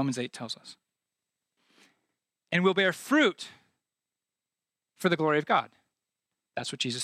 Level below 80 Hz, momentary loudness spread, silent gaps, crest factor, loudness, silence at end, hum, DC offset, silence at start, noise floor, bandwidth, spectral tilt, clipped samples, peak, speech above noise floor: -80 dBFS; 16 LU; none; 22 dB; -27 LUFS; 0 s; none; under 0.1%; 0 s; under -90 dBFS; 15 kHz; -4.5 dB/octave; under 0.1%; -10 dBFS; over 62 dB